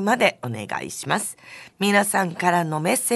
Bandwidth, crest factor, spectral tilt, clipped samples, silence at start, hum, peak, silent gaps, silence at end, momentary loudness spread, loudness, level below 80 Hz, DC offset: 12.5 kHz; 18 dB; -3.5 dB/octave; under 0.1%; 0 s; none; -4 dBFS; none; 0 s; 12 LU; -22 LUFS; -66 dBFS; under 0.1%